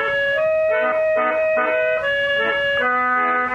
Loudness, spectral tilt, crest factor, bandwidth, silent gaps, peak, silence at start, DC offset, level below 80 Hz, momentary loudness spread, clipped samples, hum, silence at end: -18 LUFS; -4.5 dB/octave; 12 dB; 7.4 kHz; none; -8 dBFS; 0 s; under 0.1%; -54 dBFS; 1 LU; under 0.1%; none; 0 s